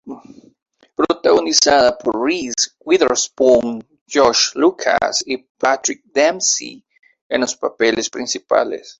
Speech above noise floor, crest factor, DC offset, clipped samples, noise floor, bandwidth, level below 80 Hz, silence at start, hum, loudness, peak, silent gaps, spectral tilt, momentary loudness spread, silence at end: 24 dB; 18 dB; under 0.1%; under 0.1%; -41 dBFS; 8.2 kHz; -54 dBFS; 0.05 s; none; -16 LUFS; 0 dBFS; 0.62-0.66 s, 4.01-4.06 s, 5.49-5.55 s, 7.21-7.30 s; -1.5 dB/octave; 10 LU; 0.05 s